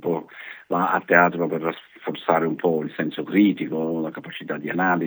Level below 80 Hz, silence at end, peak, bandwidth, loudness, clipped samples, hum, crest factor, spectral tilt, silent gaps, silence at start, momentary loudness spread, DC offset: -78 dBFS; 0 s; 0 dBFS; over 20 kHz; -23 LUFS; under 0.1%; none; 22 dB; -8.5 dB/octave; none; 0 s; 14 LU; under 0.1%